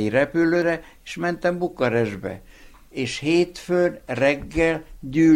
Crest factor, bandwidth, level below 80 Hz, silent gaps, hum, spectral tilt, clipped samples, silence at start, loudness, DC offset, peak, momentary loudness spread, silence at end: 16 dB; 11.5 kHz; -46 dBFS; none; none; -6 dB/octave; under 0.1%; 0 s; -23 LUFS; under 0.1%; -6 dBFS; 11 LU; 0 s